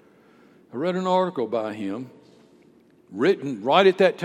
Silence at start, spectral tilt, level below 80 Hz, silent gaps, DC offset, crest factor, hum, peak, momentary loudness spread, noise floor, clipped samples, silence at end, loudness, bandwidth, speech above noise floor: 0.75 s; -6 dB/octave; -80 dBFS; none; under 0.1%; 22 dB; none; -2 dBFS; 18 LU; -56 dBFS; under 0.1%; 0 s; -22 LUFS; 10.5 kHz; 34 dB